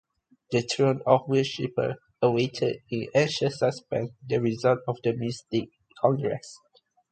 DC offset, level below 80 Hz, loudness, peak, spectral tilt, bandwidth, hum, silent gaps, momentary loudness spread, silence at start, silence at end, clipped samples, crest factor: under 0.1%; -64 dBFS; -27 LUFS; -6 dBFS; -6 dB/octave; 9.2 kHz; none; none; 8 LU; 0.5 s; 0.55 s; under 0.1%; 22 dB